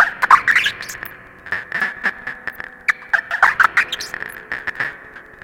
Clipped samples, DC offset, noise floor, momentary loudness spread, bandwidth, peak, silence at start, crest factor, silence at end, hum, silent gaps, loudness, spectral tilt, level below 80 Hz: under 0.1%; under 0.1%; -39 dBFS; 17 LU; 17 kHz; 0 dBFS; 0 s; 20 dB; 0.2 s; none; none; -17 LUFS; -1 dB/octave; -54 dBFS